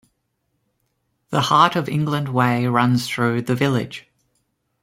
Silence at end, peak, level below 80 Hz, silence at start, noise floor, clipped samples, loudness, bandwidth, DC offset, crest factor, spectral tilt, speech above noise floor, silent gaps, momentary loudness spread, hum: 0.85 s; -2 dBFS; -58 dBFS; 1.3 s; -72 dBFS; under 0.1%; -19 LUFS; 16 kHz; under 0.1%; 20 dB; -6 dB/octave; 53 dB; none; 9 LU; none